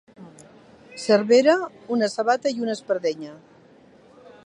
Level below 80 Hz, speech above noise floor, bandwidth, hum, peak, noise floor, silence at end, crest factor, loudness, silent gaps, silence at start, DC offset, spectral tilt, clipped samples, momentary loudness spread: -74 dBFS; 31 dB; 11 kHz; none; -6 dBFS; -52 dBFS; 1.1 s; 18 dB; -22 LUFS; none; 0.2 s; under 0.1%; -4.5 dB/octave; under 0.1%; 17 LU